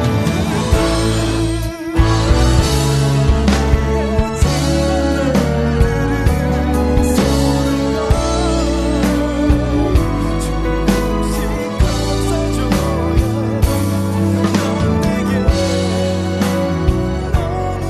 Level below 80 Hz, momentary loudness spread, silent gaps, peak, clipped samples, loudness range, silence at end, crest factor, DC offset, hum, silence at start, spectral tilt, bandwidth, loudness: -20 dBFS; 4 LU; none; 0 dBFS; under 0.1%; 2 LU; 0 s; 14 dB; under 0.1%; none; 0 s; -6 dB/octave; 13.5 kHz; -16 LUFS